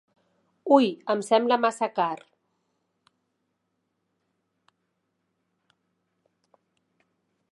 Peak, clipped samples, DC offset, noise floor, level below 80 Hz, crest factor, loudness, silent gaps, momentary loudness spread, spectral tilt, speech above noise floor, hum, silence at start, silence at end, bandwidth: -4 dBFS; under 0.1%; under 0.1%; -78 dBFS; -88 dBFS; 26 dB; -24 LUFS; none; 11 LU; -4.5 dB/octave; 55 dB; none; 0.65 s; 5.35 s; 11.5 kHz